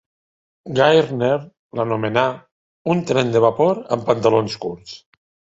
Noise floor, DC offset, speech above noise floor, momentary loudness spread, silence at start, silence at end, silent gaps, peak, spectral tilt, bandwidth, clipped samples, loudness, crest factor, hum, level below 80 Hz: under -90 dBFS; under 0.1%; over 72 dB; 16 LU; 0.65 s; 0.6 s; 1.59-1.70 s, 2.51-2.85 s; 0 dBFS; -6 dB/octave; 8 kHz; under 0.1%; -19 LUFS; 18 dB; none; -58 dBFS